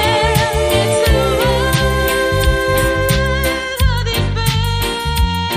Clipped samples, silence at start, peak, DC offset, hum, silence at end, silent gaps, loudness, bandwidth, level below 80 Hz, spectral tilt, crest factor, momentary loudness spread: under 0.1%; 0 s; -2 dBFS; under 0.1%; none; 0 s; none; -15 LUFS; 15.5 kHz; -20 dBFS; -4.5 dB/octave; 14 dB; 4 LU